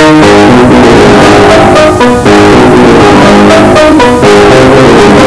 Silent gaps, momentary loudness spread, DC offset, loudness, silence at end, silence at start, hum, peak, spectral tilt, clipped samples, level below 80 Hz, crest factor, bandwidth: none; 2 LU; under 0.1%; -1 LUFS; 0 s; 0 s; none; 0 dBFS; -5.5 dB/octave; 30%; -20 dBFS; 2 dB; 11 kHz